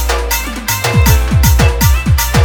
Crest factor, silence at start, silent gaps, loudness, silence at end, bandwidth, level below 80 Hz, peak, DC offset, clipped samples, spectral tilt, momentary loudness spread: 10 dB; 0 s; none; -12 LUFS; 0 s; over 20 kHz; -14 dBFS; 0 dBFS; under 0.1%; 0.1%; -4.5 dB/octave; 6 LU